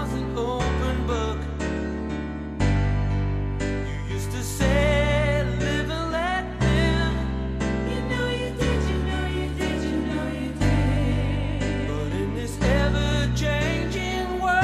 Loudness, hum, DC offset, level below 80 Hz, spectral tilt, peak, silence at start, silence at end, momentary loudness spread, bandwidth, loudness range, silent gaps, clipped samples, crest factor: -25 LUFS; none; under 0.1%; -30 dBFS; -6 dB/octave; -8 dBFS; 0 s; 0 s; 7 LU; 14 kHz; 3 LU; none; under 0.1%; 16 dB